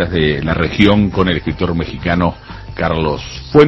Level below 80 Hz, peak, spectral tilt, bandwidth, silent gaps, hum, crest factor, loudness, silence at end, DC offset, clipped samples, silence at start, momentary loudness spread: -28 dBFS; 0 dBFS; -7.5 dB/octave; 8 kHz; none; none; 14 dB; -15 LUFS; 0 s; under 0.1%; 0.2%; 0 s; 9 LU